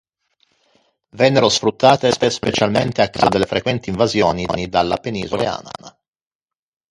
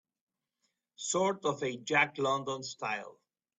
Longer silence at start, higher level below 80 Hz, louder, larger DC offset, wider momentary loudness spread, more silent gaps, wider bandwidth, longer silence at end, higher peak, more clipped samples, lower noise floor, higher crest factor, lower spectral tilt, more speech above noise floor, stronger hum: first, 1.15 s vs 1 s; first, -46 dBFS vs -78 dBFS; first, -17 LUFS vs -32 LUFS; neither; about the same, 9 LU vs 11 LU; neither; first, 11.5 kHz vs 8.4 kHz; first, 1 s vs 0.5 s; first, 0 dBFS vs -14 dBFS; neither; second, -64 dBFS vs -82 dBFS; about the same, 18 dB vs 22 dB; first, -4.5 dB/octave vs -3 dB/octave; about the same, 47 dB vs 49 dB; neither